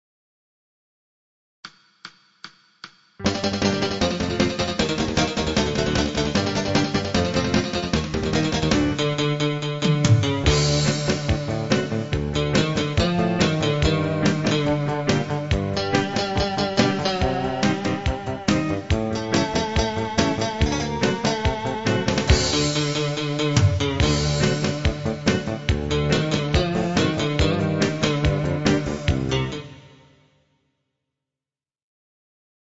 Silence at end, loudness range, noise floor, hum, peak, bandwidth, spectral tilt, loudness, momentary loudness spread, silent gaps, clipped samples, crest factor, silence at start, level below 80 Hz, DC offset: 2.75 s; 4 LU; under -90 dBFS; none; -2 dBFS; 8 kHz; -5 dB/octave; -22 LUFS; 5 LU; none; under 0.1%; 20 dB; 1.65 s; -34 dBFS; 0.2%